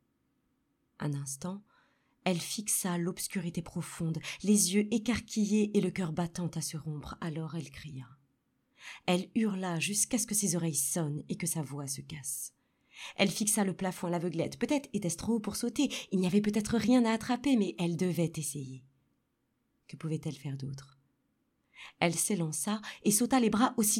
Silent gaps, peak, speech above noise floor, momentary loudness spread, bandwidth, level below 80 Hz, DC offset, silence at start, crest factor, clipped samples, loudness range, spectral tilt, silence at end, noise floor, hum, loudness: none; -14 dBFS; 46 dB; 14 LU; 17 kHz; -64 dBFS; under 0.1%; 1 s; 20 dB; under 0.1%; 7 LU; -4.5 dB/octave; 0 s; -78 dBFS; none; -32 LUFS